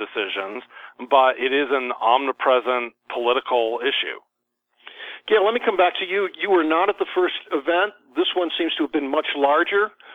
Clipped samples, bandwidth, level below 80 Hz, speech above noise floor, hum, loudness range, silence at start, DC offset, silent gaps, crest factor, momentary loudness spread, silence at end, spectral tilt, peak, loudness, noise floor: under 0.1%; 4.5 kHz; -70 dBFS; 55 dB; none; 2 LU; 0 s; under 0.1%; none; 20 dB; 10 LU; 0 s; -4.5 dB/octave; -2 dBFS; -21 LUFS; -76 dBFS